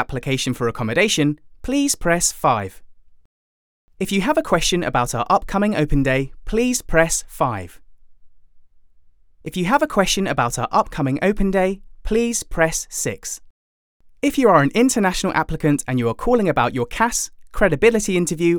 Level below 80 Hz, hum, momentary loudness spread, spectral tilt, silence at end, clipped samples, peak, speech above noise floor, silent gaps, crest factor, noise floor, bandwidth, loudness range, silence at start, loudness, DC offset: -34 dBFS; none; 8 LU; -4.5 dB/octave; 0 s; under 0.1%; 0 dBFS; 30 dB; 3.25-3.88 s, 13.50-14.00 s; 20 dB; -49 dBFS; over 20 kHz; 4 LU; 0 s; -19 LUFS; under 0.1%